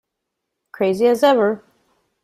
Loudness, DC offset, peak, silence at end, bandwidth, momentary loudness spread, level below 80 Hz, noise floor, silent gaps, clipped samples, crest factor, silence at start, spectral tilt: -17 LUFS; under 0.1%; -4 dBFS; 0.65 s; 15.5 kHz; 8 LU; -64 dBFS; -79 dBFS; none; under 0.1%; 16 dB; 0.8 s; -5.5 dB/octave